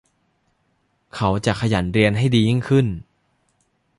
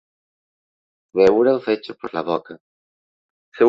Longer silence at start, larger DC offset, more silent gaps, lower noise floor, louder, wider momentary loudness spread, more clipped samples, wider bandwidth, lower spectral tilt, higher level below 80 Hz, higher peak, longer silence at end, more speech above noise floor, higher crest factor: about the same, 1.15 s vs 1.15 s; neither; second, none vs 2.60-3.52 s; second, -67 dBFS vs under -90 dBFS; about the same, -19 LUFS vs -19 LUFS; second, 8 LU vs 13 LU; neither; first, 11.5 kHz vs 7.4 kHz; about the same, -6.5 dB/octave vs -7 dB/octave; first, -44 dBFS vs -58 dBFS; about the same, -4 dBFS vs -2 dBFS; first, 0.95 s vs 0 s; second, 49 dB vs over 71 dB; about the same, 18 dB vs 18 dB